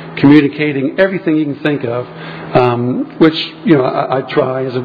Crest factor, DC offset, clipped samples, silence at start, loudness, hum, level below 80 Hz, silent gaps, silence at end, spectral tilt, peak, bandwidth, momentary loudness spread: 12 dB; under 0.1%; 0.4%; 0 s; -13 LUFS; none; -50 dBFS; none; 0 s; -9 dB/octave; 0 dBFS; 5.4 kHz; 10 LU